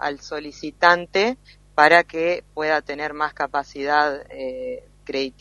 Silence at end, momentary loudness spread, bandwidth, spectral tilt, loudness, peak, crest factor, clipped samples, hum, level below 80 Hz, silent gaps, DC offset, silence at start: 0.1 s; 16 LU; 11.5 kHz; -4 dB/octave; -21 LUFS; 0 dBFS; 22 dB; under 0.1%; 50 Hz at -55 dBFS; -54 dBFS; none; under 0.1%; 0 s